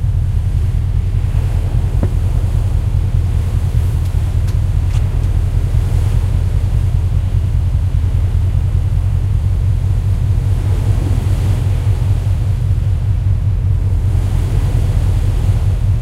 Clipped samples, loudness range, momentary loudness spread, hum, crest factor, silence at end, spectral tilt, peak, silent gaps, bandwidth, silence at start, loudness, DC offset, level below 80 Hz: under 0.1%; 1 LU; 1 LU; none; 12 dB; 0 s; -8 dB/octave; -2 dBFS; none; 12.5 kHz; 0 s; -16 LUFS; under 0.1%; -18 dBFS